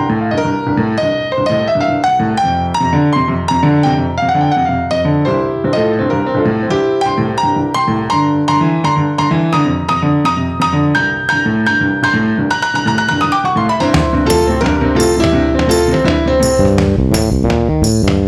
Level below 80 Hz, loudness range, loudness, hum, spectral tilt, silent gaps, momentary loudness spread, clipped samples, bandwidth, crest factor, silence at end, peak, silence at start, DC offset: -28 dBFS; 2 LU; -14 LUFS; none; -6 dB/octave; none; 3 LU; under 0.1%; 13.5 kHz; 12 dB; 0 s; 0 dBFS; 0 s; under 0.1%